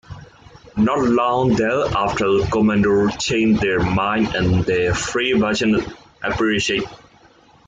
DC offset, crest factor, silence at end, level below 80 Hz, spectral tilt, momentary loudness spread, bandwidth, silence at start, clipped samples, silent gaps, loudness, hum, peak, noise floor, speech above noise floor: under 0.1%; 12 dB; 0.7 s; -40 dBFS; -5.5 dB/octave; 5 LU; 9.4 kHz; 0.1 s; under 0.1%; none; -18 LUFS; none; -6 dBFS; -51 dBFS; 33 dB